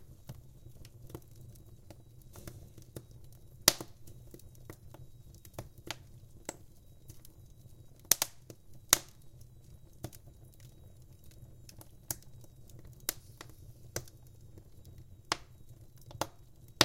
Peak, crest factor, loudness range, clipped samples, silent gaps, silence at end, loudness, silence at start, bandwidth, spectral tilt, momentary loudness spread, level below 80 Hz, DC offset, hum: 0 dBFS; 40 dB; 16 LU; under 0.1%; none; 0 s; -34 LUFS; 0 s; 17 kHz; -1.5 dB/octave; 28 LU; -58 dBFS; under 0.1%; none